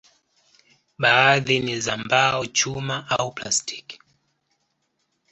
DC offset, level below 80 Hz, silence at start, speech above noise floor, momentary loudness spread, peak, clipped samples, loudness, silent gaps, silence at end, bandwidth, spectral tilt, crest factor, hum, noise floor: under 0.1%; -60 dBFS; 1 s; 51 dB; 12 LU; -4 dBFS; under 0.1%; -20 LUFS; none; 1.35 s; 8.4 kHz; -2.5 dB/octave; 22 dB; none; -73 dBFS